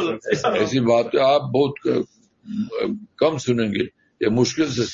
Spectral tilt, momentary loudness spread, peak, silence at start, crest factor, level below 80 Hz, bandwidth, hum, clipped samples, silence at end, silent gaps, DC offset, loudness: -5.5 dB/octave; 10 LU; -6 dBFS; 0 s; 16 dB; -60 dBFS; 7.6 kHz; none; under 0.1%; 0 s; none; under 0.1%; -21 LUFS